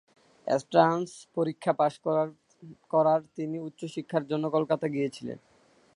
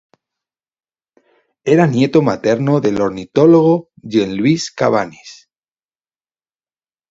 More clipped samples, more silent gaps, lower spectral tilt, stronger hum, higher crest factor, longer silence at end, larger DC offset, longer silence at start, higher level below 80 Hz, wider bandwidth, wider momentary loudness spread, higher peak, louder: neither; neither; about the same, -6.5 dB/octave vs -7 dB/octave; neither; first, 22 dB vs 16 dB; second, 0.6 s vs 1.8 s; neither; second, 0.45 s vs 1.65 s; second, -76 dBFS vs -56 dBFS; first, 11.5 kHz vs 7.8 kHz; first, 13 LU vs 9 LU; second, -6 dBFS vs 0 dBFS; second, -28 LUFS vs -14 LUFS